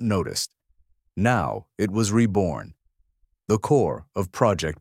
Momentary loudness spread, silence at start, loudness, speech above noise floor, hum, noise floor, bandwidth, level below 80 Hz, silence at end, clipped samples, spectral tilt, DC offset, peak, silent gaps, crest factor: 11 LU; 0 s; -24 LUFS; 43 dB; none; -66 dBFS; 16 kHz; -50 dBFS; 0.05 s; under 0.1%; -5.5 dB/octave; under 0.1%; -4 dBFS; none; 20 dB